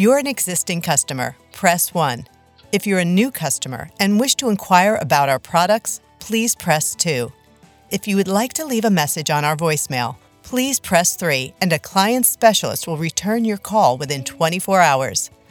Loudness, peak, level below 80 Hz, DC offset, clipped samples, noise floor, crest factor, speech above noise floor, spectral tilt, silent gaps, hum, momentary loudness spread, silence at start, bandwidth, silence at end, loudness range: -18 LUFS; 0 dBFS; -56 dBFS; under 0.1%; under 0.1%; -50 dBFS; 18 dB; 32 dB; -3.5 dB/octave; none; none; 9 LU; 0 s; over 20 kHz; 0.25 s; 3 LU